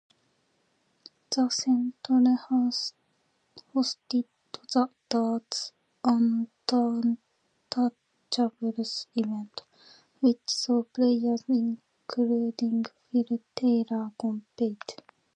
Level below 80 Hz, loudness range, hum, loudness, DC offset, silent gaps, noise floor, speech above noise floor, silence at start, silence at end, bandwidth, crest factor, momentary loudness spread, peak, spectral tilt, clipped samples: -82 dBFS; 3 LU; none; -28 LUFS; under 0.1%; none; -72 dBFS; 45 dB; 1.3 s; 0.45 s; 9.2 kHz; 18 dB; 9 LU; -10 dBFS; -4.5 dB/octave; under 0.1%